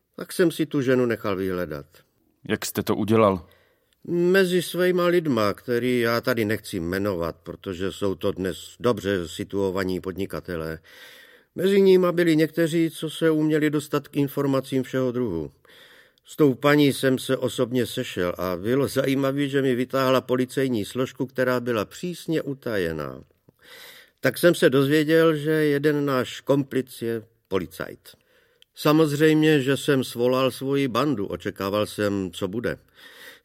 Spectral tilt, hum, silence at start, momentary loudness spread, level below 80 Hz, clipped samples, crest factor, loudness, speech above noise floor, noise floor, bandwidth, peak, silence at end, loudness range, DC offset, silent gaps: -6 dB/octave; none; 0.2 s; 12 LU; -58 dBFS; under 0.1%; 20 dB; -23 LUFS; 37 dB; -60 dBFS; 16.5 kHz; -4 dBFS; 0.1 s; 5 LU; under 0.1%; none